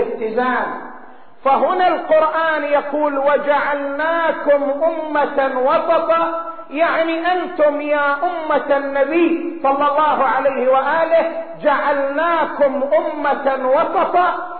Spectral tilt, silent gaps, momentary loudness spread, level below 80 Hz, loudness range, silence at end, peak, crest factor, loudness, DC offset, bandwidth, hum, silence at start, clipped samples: -1.5 dB/octave; none; 4 LU; -58 dBFS; 1 LU; 0 s; -4 dBFS; 14 dB; -17 LUFS; 1%; 4.5 kHz; none; 0 s; under 0.1%